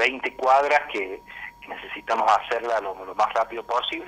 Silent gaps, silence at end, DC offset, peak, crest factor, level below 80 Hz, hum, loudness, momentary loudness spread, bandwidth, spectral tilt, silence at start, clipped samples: none; 0 s; under 0.1%; -4 dBFS; 20 dB; -60 dBFS; none; -23 LUFS; 16 LU; 15 kHz; -2.5 dB/octave; 0 s; under 0.1%